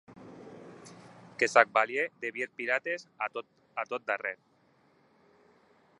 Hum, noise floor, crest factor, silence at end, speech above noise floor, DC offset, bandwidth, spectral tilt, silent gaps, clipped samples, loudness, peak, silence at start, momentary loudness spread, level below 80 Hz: none; -67 dBFS; 30 dB; 1.65 s; 36 dB; under 0.1%; 11 kHz; -3 dB/octave; none; under 0.1%; -30 LUFS; -4 dBFS; 0.1 s; 26 LU; -82 dBFS